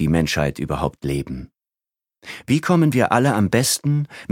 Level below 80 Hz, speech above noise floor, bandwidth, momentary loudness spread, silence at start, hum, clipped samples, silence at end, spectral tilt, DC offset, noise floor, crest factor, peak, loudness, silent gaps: -40 dBFS; 70 dB; 17 kHz; 14 LU; 0 s; none; under 0.1%; 0.05 s; -5.5 dB/octave; under 0.1%; -90 dBFS; 20 dB; 0 dBFS; -19 LUFS; none